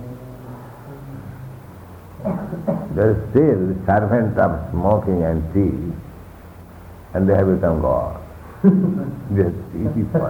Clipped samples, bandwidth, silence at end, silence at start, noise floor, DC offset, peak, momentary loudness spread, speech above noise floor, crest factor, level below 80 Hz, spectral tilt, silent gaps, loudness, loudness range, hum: under 0.1%; 19 kHz; 0 s; 0 s; -39 dBFS; under 0.1%; -4 dBFS; 23 LU; 22 dB; 16 dB; -36 dBFS; -10.5 dB/octave; none; -19 LUFS; 4 LU; none